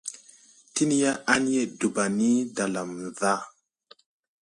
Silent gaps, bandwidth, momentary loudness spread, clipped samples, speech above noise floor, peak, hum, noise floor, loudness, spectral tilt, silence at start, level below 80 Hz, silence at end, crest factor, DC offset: none; 11.5 kHz; 12 LU; under 0.1%; 33 dB; -4 dBFS; none; -58 dBFS; -26 LUFS; -4 dB/octave; 0.05 s; -68 dBFS; 0.9 s; 22 dB; under 0.1%